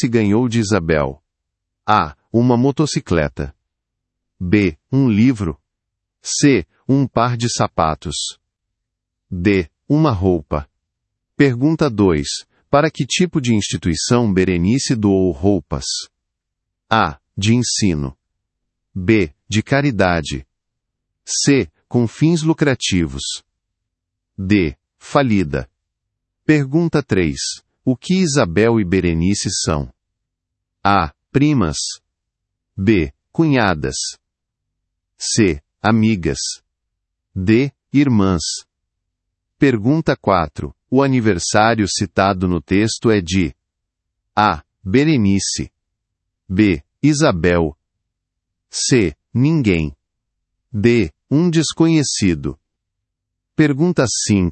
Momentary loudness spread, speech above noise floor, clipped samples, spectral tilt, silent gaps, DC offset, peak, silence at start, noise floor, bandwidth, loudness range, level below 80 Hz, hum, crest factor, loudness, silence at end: 10 LU; 63 dB; under 0.1%; -5 dB/octave; none; under 0.1%; 0 dBFS; 0 s; -79 dBFS; 8.8 kHz; 3 LU; -42 dBFS; none; 18 dB; -17 LUFS; 0 s